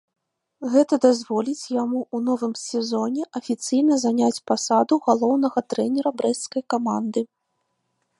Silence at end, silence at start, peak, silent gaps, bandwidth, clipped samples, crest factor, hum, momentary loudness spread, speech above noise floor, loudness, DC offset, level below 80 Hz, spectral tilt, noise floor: 0.95 s; 0.6 s; -4 dBFS; none; 11.5 kHz; under 0.1%; 18 dB; none; 8 LU; 53 dB; -22 LUFS; under 0.1%; -76 dBFS; -4.5 dB/octave; -74 dBFS